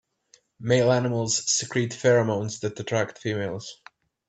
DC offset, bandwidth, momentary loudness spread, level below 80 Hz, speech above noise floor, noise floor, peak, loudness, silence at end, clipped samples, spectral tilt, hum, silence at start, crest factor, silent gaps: under 0.1%; 9 kHz; 11 LU; -64 dBFS; 37 dB; -62 dBFS; -6 dBFS; -24 LUFS; 0.55 s; under 0.1%; -4 dB/octave; none; 0.6 s; 20 dB; none